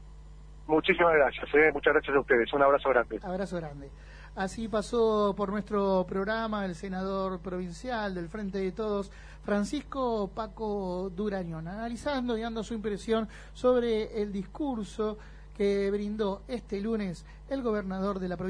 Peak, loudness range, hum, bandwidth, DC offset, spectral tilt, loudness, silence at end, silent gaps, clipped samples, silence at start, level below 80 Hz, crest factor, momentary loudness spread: -10 dBFS; 8 LU; none; 10.5 kHz; under 0.1%; -6 dB/octave; -30 LUFS; 0 s; none; under 0.1%; 0 s; -48 dBFS; 20 dB; 13 LU